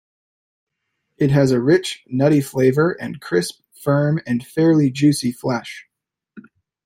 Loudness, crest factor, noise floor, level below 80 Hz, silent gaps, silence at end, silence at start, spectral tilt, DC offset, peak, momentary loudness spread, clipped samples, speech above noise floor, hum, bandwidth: -18 LUFS; 16 dB; -75 dBFS; -58 dBFS; none; 0.45 s; 1.2 s; -6.5 dB/octave; under 0.1%; -4 dBFS; 11 LU; under 0.1%; 58 dB; none; 16 kHz